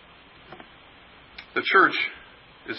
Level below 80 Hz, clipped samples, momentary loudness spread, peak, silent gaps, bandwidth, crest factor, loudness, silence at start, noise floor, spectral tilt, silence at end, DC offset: -64 dBFS; under 0.1%; 27 LU; -4 dBFS; none; 5.8 kHz; 22 dB; -21 LUFS; 0.5 s; -51 dBFS; -7.5 dB/octave; 0 s; under 0.1%